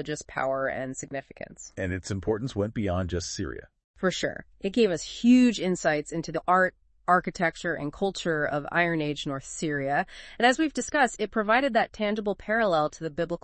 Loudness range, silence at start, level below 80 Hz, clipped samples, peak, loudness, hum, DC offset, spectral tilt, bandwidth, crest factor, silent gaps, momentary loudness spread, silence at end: 6 LU; 0 s; -54 dBFS; under 0.1%; -6 dBFS; -27 LUFS; none; under 0.1%; -5 dB/octave; 8.8 kHz; 20 dB; 3.84-3.94 s; 11 LU; 0.05 s